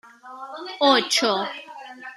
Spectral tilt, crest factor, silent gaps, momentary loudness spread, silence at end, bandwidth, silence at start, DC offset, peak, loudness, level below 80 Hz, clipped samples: -1.5 dB/octave; 22 dB; none; 21 LU; 0 s; 14 kHz; 0.05 s; under 0.1%; -4 dBFS; -20 LUFS; -80 dBFS; under 0.1%